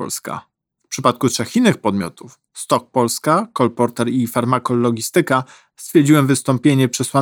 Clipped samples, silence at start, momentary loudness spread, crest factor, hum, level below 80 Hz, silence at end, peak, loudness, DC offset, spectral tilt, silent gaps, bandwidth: under 0.1%; 0 s; 15 LU; 16 dB; none; -62 dBFS; 0 s; 0 dBFS; -17 LUFS; under 0.1%; -5.5 dB/octave; none; 19.5 kHz